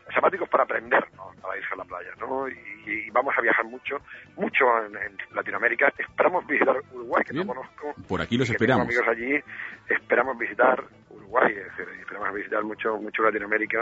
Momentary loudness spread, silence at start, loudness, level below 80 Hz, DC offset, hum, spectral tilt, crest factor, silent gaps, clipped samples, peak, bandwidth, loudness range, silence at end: 13 LU; 0.05 s; -25 LUFS; -60 dBFS; under 0.1%; none; -6 dB/octave; 20 dB; none; under 0.1%; -6 dBFS; 8 kHz; 3 LU; 0 s